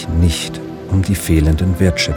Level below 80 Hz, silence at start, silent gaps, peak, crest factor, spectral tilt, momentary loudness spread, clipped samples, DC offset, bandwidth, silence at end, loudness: -24 dBFS; 0 s; none; 0 dBFS; 14 dB; -5.5 dB/octave; 8 LU; under 0.1%; under 0.1%; 20 kHz; 0 s; -16 LUFS